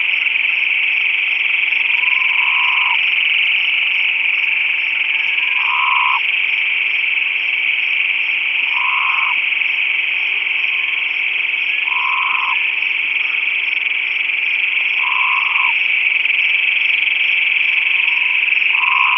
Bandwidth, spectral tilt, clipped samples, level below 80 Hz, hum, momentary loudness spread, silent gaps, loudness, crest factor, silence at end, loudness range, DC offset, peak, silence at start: 6 kHz; 0 dB/octave; under 0.1%; -62 dBFS; none; 3 LU; none; -13 LUFS; 16 dB; 0 s; 2 LU; under 0.1%; 0 dBFS; 0 s